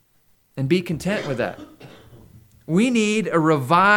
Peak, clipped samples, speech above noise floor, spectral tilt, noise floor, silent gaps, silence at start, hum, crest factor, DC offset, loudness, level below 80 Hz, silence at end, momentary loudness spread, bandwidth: -2 dBFS; under 0.1%; 41 dB; -5.5 dB/octave; -61 dBFS; none; 0.55 s; none; 18 dB; under 0.1%; -21 LUFS; -56 dBFS; 0 s; 11 LU; 19 kHz